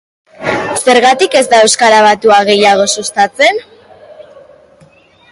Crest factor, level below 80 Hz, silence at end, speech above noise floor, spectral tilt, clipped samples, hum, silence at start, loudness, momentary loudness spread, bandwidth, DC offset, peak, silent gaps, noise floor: 10 dB; -52 dBFS; 1.1 s; 36 dB; -2 dB/octave; under 0.1%; none; 0.4 s; -8 LUFS; 9 LU; 11.5 kHz; under 0.1%; 0 dBFS; none; -44 dBFS